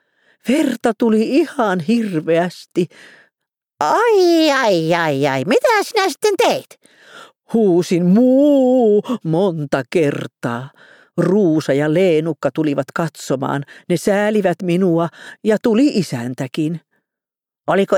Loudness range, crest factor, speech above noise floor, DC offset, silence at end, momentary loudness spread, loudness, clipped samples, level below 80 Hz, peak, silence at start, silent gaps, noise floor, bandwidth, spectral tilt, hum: 3 LU; 14 dB; 72 dB; under 0.1%; 0 s; 11 LU; -16 LUFS; under 0.1%; -62 dBFS; -2 dBFS; 0.45 s; none; -88 dBFS; 18 kHz; -6 dB/octave; none